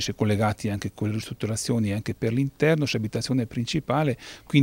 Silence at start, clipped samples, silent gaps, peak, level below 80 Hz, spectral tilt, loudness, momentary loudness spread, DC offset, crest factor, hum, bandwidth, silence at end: 0 s; under 0.1%; none; -6 dBFS; -52 dBFS; -5.5 dB/octave; -26 LUFS; 7 LU; under 0.1%; 18 dB; none; 16 kHz; 0 s